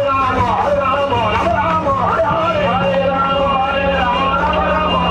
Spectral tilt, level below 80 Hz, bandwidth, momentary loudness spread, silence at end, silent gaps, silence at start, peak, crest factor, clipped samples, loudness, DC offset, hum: -6.5 dB/octave; -32 dBFS; 9.8 kHz; 1 LU; 0 s; none; 0 s; -4 dBFS; 12 dB; under 0.1%; -15 LUFS; under 0.1%; none